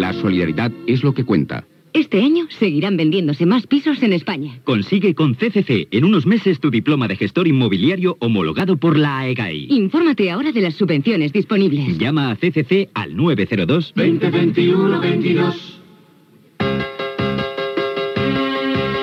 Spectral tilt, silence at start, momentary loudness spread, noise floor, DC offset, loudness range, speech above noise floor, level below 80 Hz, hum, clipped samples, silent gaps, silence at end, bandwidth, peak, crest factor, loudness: -8.5 dB/octave; 0 s; 6 LU; -50 dBFS; under 0.1%; 3 LU; 34 dB; -54 dBFS; none; under 0.1%; none; 0 s; 6.6 kHz; -4 dBFS; 14 dB; -17 LUFS